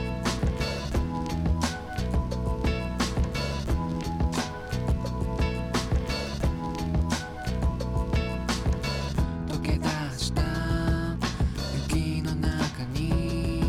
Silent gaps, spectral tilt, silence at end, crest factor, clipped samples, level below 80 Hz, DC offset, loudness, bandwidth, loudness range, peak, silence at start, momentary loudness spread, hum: none; -5.5 dB/octave; 0 s; 16 dB; under 0.1%; -32 dBFS; under 0.1%; -29 LUFS; 15 kHz; 1 LU; -12 dBFS; 0 s; 3 LU; none